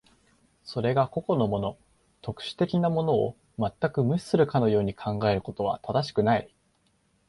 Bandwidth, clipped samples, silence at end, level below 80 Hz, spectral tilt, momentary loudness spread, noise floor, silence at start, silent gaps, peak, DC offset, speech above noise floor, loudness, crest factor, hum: 11.5 kHz; under 0.1%; 0.85 s; -56 dBFS; -7.5 dB/octave; 11 LU; -68 dBFS; 0.65 s; none; -8 dBFS; under 0.1%; 43 dB; -27 LUFS; 18 dB; none